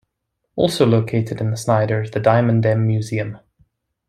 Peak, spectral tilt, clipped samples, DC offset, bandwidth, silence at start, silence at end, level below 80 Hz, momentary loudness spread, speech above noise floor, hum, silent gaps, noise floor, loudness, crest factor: -2 dBFS; -7 dB/octave; under 0.1%; under 0.1%; 13.5 kHz; 0.55 s; 0.7 s; -54 dBFS; 9 LU; 58 dB; none; none; -75 dBFS; -18 LUFS; 18 dB